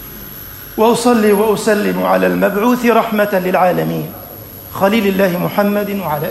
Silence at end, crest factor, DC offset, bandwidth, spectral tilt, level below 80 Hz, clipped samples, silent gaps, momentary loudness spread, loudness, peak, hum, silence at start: 0 s; 14 dB; under 0.1%; 16 kHz; -5.5 dB/octave; -46 dBFS; under 0.1%; none; 17 LU; -14 LUFS; 0 dBFS; none; 0 s